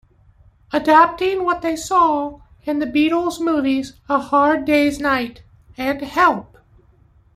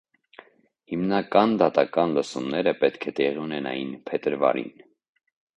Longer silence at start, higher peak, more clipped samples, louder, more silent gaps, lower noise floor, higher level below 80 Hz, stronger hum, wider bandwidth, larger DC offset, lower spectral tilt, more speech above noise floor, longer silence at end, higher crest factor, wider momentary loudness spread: second, 0.7 s vs 0.9 s; about the same, -2 dBFS vs -2 dBFS; neither; first, -18 LUFS vs -24 LUFS; neither; about the same, -53 dBFS vs -52 dBFS; first, -50 dBFS vs -66 dBFS; neither; first, 15.5 kHz vs 10 kHz; neither; second, -4.5 dB/octave vs -6 dB/octave; first, 35 dB vs 29 dB; about the same, 0.95 s vs 0.85 s; about the same, 18 dB vs 22 dB; about the same, 11 LU vs 10 LU